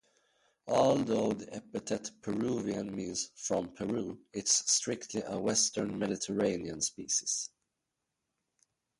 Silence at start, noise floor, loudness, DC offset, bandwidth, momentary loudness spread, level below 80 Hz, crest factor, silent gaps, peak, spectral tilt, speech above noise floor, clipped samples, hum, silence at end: 0.65 s; -86 dBFS; -32 LUFS; under 0.1%; 11.5 kHz; 10 LU; -66 dBFS; 22 dB; none; -12 dBFS; -3 dB/octave; 53 dB; under 0.1%; none; 1.5 s